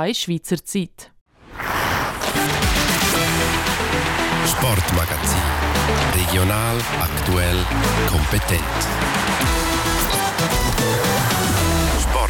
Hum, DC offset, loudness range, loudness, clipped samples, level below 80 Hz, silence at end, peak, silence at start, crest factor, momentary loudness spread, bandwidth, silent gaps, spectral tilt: none; under 0.1%; 1 LU; -19 LUFS; under 0.1%; -28 dBFS; 0 s; -8 dBFS; 0 s; 12 dB; 4 LU; 19 kHz; 1.21-1.26 s; -4 dB/octave